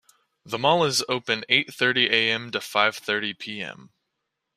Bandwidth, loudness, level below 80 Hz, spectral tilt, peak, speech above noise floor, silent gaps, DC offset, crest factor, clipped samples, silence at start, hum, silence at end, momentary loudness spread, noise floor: 15.5 kHz; -22 LUFS; -68 dBFS; -2.5 dB/octave; -4 dBFS; 56 dB; none; under 0.1%; 22 dB; under 0.1%; 0.45 s; none; 0.75 s; 13 LU; -80 dBFS